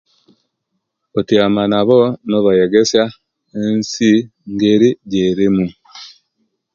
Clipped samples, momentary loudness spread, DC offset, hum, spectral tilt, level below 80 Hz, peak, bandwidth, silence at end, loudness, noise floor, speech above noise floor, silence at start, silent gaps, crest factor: under 0.1%; 12 LU; under 0.1%; none; -5.5 dB/octave; -52 dBFS; 0 dBFS; 7.6 kHz; 0.7 s; -14 LUFS; -73 dBFS; 59 dB; 1.15 s; none; 16 dB